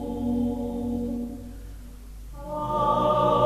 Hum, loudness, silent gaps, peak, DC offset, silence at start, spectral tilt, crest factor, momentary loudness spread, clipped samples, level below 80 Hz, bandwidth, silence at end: none; -26 LUFS; none; -10 dBFS; under 0.1%; 0 s; -7.5 dB/octave; 16 dB; 22 LU; under 0.1%; -42 dBFS; 14 kHz; 0 s